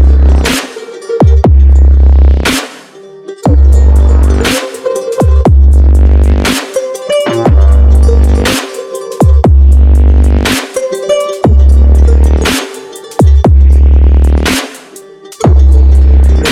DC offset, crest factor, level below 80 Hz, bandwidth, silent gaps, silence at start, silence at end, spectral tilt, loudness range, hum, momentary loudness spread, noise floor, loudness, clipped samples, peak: under 0.1%; 6 dB; -6 dBFS; 14 kHz; none; 0 s; 0 s; -6 dB/octave; 2 LU; none; 10 LU; -31 dBFS; -8 LUFS; 1%; 0 dBFS